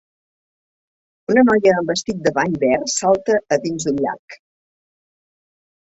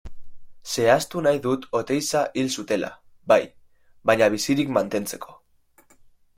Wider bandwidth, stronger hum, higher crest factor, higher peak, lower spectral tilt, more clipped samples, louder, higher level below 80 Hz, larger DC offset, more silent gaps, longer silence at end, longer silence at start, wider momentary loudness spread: second, 8.2 kHz vs 16.5 kHz; neither; about the same, 18 dB vs 20 dB; about the same, -2 dBFS vs -4 dBFS; about the same, -4.5 dB/octave vs -4 dB/octave; neither; first, -18 LUFS vs -23 LUFS; about the same, -56 dBFS vs -54 dBFS; neither; first, 4.19-4.28 s vs none; first, 1.5 s vs 1.05 s; first, 1.3 s vs 0.05 s; second, 9 LU vs 16 LU